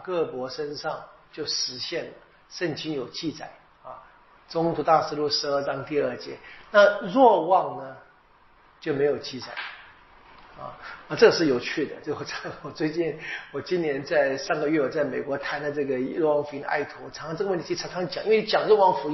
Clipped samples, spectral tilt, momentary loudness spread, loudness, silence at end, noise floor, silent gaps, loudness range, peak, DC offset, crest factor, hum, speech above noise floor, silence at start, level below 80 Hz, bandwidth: under 0.1%; -3 dB/octave; 19 LU; -25 LUFS; 0 s; -57 dBFS; none; 9 LU; -4 dBFS; under 0.1%; 22 dB; none; 32 dB; 0 s; -62 dBFS; 6.2 kHz